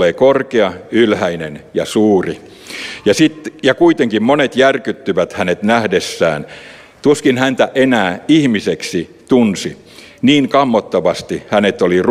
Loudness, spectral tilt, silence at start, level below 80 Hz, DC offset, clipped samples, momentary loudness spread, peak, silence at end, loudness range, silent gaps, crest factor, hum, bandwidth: -14 LUFS; -5 dB/octave; 0 s; -52 dBFS; under 0.1%; under 0.1%; 11 LU; 0 dBFS; 0 s; 1 LU; none; 14 dB; none; 14.5 kHz